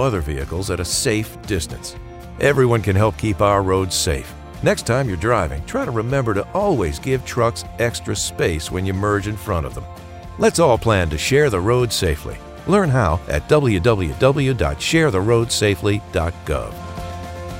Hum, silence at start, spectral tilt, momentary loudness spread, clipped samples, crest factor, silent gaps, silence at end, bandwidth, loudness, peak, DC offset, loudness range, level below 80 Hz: none; 0 s; -5 dB/octave; 14 LU; under 0.1%; 18 dB; none; 0 s; 16 kHz; -19 LUFS; 0 dBFS; under 0.1%; 3 LU; -36 dBFS